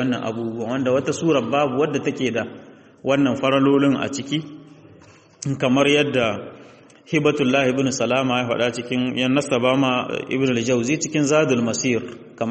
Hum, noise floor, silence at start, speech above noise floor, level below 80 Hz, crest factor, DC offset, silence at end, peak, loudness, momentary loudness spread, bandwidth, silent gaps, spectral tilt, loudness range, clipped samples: none; -49 dBFS; 0 s; 29 dB; -58 dBFS; 16 dB; under 0.1%; 0 s; -4 dBFS; -20 LUFS; 10 LU; 8.8 kHz; none; -5 dB/octave; 2 LU; under 0.1%